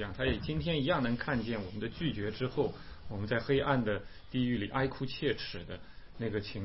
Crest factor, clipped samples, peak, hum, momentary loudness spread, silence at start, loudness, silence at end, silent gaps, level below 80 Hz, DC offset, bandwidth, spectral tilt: 18 dB; under 0.1%; -16 dBFS; none; 10 LU; 0 s; -34 LUFS; 0 s; none; -50 dBFS; 0.3%; 5.8 kHz; -5 dB/octave